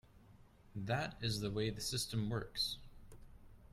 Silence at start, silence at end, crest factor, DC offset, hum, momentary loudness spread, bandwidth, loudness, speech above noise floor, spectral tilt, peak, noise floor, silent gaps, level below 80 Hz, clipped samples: 0.15 s; 0.05 s; 18 dB; under 0.1%; none; 8 LU; 15.5 kHz; -40 LUFS; 23 dB; -4.5 dB/octave; -24 dBFS; -63 dBFS; none; -58 dBFS; under 0.1%